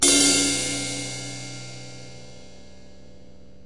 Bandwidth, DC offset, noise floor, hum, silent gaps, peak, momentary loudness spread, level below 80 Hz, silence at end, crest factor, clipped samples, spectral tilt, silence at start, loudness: 11.5 kHz; 0.8%; -49 dBFS; none; none; -2 dBFS; 26 LU; -52 dBFS; 1.05 s; 24 dB; under 0.1%; -1.5 dB/octave; 0 s; -21 LUFS